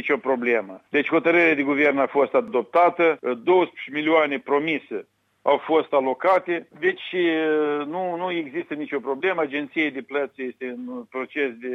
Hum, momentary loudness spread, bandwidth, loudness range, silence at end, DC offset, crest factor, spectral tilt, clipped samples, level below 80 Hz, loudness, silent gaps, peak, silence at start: none; 11 LU; 6.2 kHz; 7 LU; 0 s; under 0.1%; 18 dB; -6.5 dB/octave; under 0.1%; -74 dBFS; -22 LUFS; none; -4 dBFS; 0 s